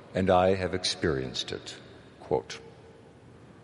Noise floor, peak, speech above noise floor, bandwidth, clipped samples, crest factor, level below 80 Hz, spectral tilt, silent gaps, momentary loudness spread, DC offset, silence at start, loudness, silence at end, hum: -52 dBFS; -10 dBFS; 24 dB; 11.5 kHz; under 0.1%; 20 dB; -56 dBFS; -4.5 dB/octave; none; 19 LU; under 0.1%; 0 s; -28 LUFS; 0.1 s; none